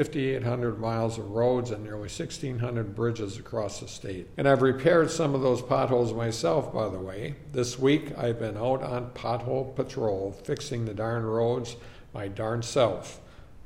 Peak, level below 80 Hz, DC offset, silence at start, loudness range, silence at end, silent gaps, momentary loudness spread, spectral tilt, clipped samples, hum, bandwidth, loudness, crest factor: -8 dBFS; -52 dBFS; under 0.1%; 0 s; 5 LU; 0 s; none; 13 LU; -6 dB/octave; under 0.1%; none; 14.5 kHz; -28 LUFS; 20 dB